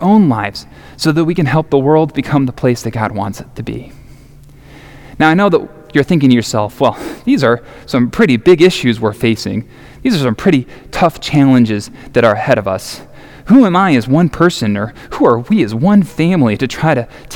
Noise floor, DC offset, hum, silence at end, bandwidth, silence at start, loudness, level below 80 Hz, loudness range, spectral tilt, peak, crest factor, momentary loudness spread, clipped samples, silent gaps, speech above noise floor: -38 dBFS; under 0.1%; none; 0 s; 18 kHz; 0 s; -13 LUFS; -40 dBFS; 5 LU; -6.5 dB/octave; 0 dBFS; 12 dB; 12 LU; 0.2%; none; 26 dB